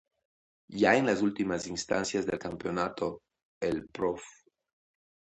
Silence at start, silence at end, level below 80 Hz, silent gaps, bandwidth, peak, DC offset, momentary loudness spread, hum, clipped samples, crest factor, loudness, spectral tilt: 0.7 s; 1.1 s; -62 dBFS; 3.43-3.61 s; 10.5 kHz; -10 dBFS; under 0.1%; 13 LU; none; under 0.1%; 22 dB; -30 LUFS; -4.5 dB/octave